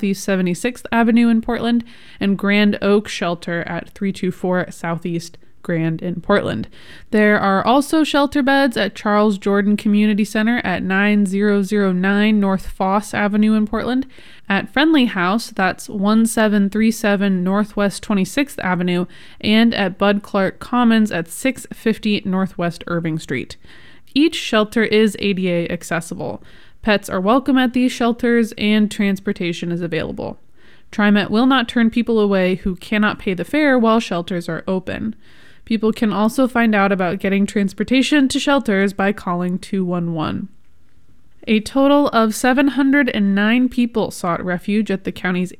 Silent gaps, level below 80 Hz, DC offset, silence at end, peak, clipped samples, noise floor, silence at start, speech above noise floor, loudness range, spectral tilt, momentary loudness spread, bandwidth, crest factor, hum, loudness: none; -46 dBFS; 1%; 0.05 s; -2 dBFS; under 0.1%; -54 dBFS; 0 s; 37 dB; 4 LU; -5.5 dB/octave; 9 LU; 15 kHz; 16 dB; none; -18 LUFS